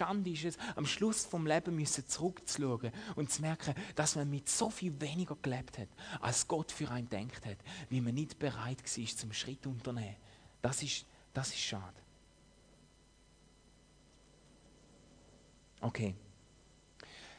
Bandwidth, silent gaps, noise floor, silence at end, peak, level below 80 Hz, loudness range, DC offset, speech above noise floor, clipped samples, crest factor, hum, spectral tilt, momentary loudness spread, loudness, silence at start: 11 kHz; none; -65 dBFS; 0 s; -18 dBFS; -66 dBFS; 11 LU; under 0.1%; 27 dB; under 0.1%; 22 dB; none; -4 dB/octave; 12 LU; -38 LUFS; 0 s